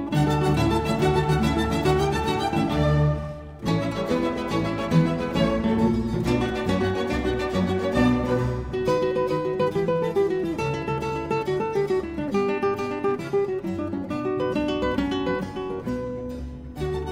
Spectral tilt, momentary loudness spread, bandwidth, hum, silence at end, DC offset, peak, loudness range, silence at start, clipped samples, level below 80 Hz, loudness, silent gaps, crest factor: -7 dB/octave; 8 LU; 16 kHz; none; 0 s; 0.1%; -8 dBFS; 3 LU; 0 s; under 0.1%; -38 dBFS; -24 LUFS; none; 16 dB